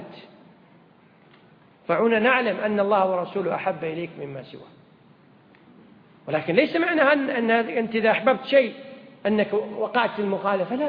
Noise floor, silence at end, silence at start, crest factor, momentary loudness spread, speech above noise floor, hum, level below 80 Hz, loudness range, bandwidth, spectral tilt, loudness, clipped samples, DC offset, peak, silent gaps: -54 dBFS; 0 s; 0 s; 20 dB; 17 LU; 32 dB; none; -70 dBFS; 7 LU; 5.2 kHz; -8.5 dB/octave; -22 LUFS; under 0.1%; under 0.1%; -4 dBFS; none